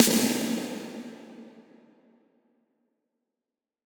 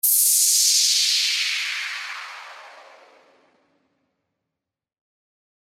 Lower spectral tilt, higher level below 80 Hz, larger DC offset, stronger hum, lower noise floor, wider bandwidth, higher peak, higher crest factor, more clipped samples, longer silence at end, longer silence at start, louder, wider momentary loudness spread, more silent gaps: first, -2.5 dB/octave vs 7.5 dB/octave; first, -74 dBFS vs under -90 dBFS; neither; neither; about the same, -89 dBFS vs -86 dBFS; first, over 20 kHz vs 17.5 kHz; about the same, -6 dBFS vs -6 dBFS; first, 26 dB vs 20 dB; neither; second, 2.4 s vs 2.9 s; about the same, 0 s vs 0.05 s; second, -27 LUFS vs -17 LUFS; first, 25 LU vs 19 LU; neither